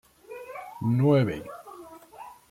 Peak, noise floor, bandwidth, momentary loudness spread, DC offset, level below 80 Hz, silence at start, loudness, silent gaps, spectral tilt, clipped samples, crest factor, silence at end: -10 dBFS; -47 dBFS; 15.5 kHz; 24 LU; under 0.1%; -62 dBFS; 0.3 s; -25 LUFS; none; -8.5 dB/octave; under 0.1%; 18 dB; 0.15 s